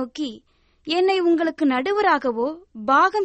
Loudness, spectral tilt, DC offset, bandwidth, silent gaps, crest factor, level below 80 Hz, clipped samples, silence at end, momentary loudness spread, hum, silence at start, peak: -21 LUFS; -4 dB/octave; under 0.1%; 8.4 kHz; none; 14 dB; -62 dBFS; under 0.1%; 0 s; 13 LU; none; 0 s; -6 dBFS